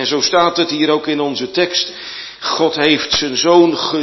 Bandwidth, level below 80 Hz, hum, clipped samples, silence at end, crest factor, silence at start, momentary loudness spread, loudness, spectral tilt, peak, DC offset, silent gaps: 6.2 kHz; -52 dBFS; none; under 0.1%; 0 s; 14 dB; 0 s; 10 LU; -14 LUFS; -3 dB/octave; 0 dBFS; under 0.1%; none